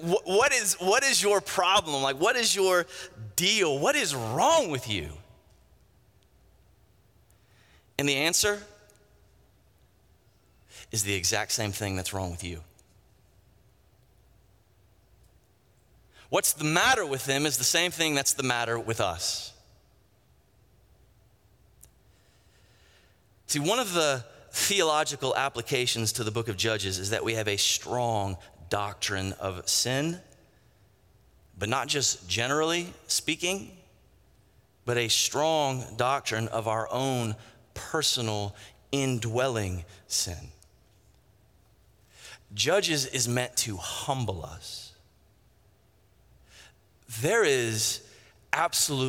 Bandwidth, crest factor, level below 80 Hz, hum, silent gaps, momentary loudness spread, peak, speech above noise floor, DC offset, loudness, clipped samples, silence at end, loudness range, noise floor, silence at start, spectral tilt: 17 kHz; 24 dB; -60 dBFS; none; none; 13 LU; -6 dBFS; 36 dB; under 0.1%; -26 LUFS; under 0.1%; 0 s; 9 LU; -64 dBFS; 0 s; -2.5 dB/octave